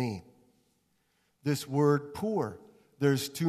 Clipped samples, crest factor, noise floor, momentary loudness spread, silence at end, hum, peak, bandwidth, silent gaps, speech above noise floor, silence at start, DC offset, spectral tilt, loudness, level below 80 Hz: under 0.1%; 18 dB; -73 dBFS; 11 LU; 0 s; none; -14 dBFS; 14 kHz; none; 44 dB; 0 s; under 0.1%; -6 dB/octave; -30 LUFS; -68 dBFS